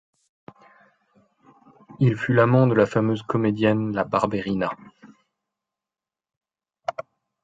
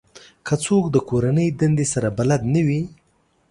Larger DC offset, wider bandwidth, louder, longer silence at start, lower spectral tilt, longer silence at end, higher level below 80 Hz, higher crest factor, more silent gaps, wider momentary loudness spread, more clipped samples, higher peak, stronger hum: neither; second, 7.8 kHz vs 11.5 kHz; about the same, -22 LUFS vs -20 LUFS; first, 1.9 s vs 0.15 s; first, -8.5 dB/octave vs -6.5 dB/octave; second, 0.4 s vs 0.6 s; second, -58 dBFS vs -48 dBFS; about the same, 20 dB vs 16 dB; first, 6.37-6.41 s vs none; first, 15 LU vs 7 LU; neither; about the same, -4 dBFS vs -4 dBFS; neither